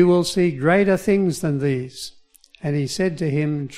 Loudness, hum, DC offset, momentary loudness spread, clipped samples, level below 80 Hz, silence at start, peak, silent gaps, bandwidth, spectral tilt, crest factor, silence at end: -20 LUFS; none; under 0.1%; 13 LU; under 0.1%; -52 dBFS; 0 s; -4 dBFS; none; 15 kHz; -6 dB/octave; 16 dB; 0 s